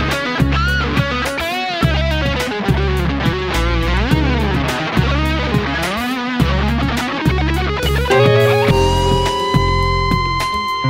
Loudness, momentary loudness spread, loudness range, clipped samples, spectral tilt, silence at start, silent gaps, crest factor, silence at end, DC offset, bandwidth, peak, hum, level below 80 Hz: -16 LUFS; 5 LU; 3 LU; under 0.1%; -5.5 dB/octave; 0 s; none; 14 dB; 0 s; 0.2%; 16.5 kHz; -2 dBFS; none; -22 dBFS